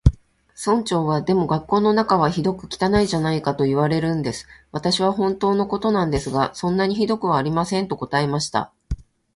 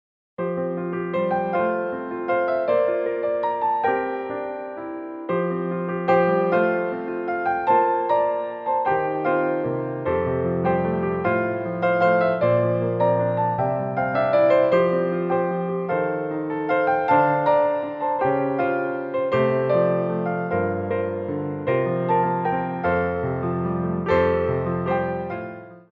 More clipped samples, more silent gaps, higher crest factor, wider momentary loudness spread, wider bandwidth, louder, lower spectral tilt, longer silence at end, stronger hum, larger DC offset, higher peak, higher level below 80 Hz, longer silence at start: neither; neither; about the same, 20 dB vs 16 dB; about the same, 8 LU vs 8 LU; first, 11.5 kHz vs 5.4 kHz; about the same, -21 LUFS vs -22 LUFS; second, -6 dB/octave vs -10 dB/octave; first, 0.35 s vs 0.1 s; neither; neither; first, 0 dBFS vs -6 dBFS; first, -36 dBFS vs -54 dBFS; second, 0.05 s vs 0.4 s